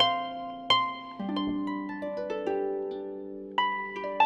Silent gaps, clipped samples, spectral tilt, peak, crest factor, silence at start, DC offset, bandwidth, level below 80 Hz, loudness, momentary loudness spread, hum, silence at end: none; under 0.1%; -5 dB/octave; -8 dBFS; 22 dB; 0 s; under 0.1%; 9.2 kHz; -64 dBFS; -31 LUFS; 12 LU; none; 0 s